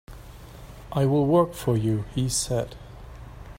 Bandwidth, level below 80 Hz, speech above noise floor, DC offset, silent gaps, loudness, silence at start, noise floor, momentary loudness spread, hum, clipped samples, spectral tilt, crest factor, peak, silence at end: 16 kHz; -44 dBFS; 20 dB; under 0.1%; none; -24 LUFS; 0.1 s; -43 dBFS; 24 LU; none; under 0.1%; -6 dB/octave; 18 dB; -8 dBFS; 0 s